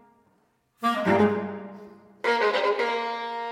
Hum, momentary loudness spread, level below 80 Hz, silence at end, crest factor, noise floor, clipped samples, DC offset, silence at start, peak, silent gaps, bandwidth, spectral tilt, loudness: none; 16 LU; -72 dBFS; 0 s; 18 dB; -67 dBFS; under 0.1%; under 0.1%; 0.8 s; -10 dBFS; none; 16 kHz; -5.5 dB/octave; -25 LUFS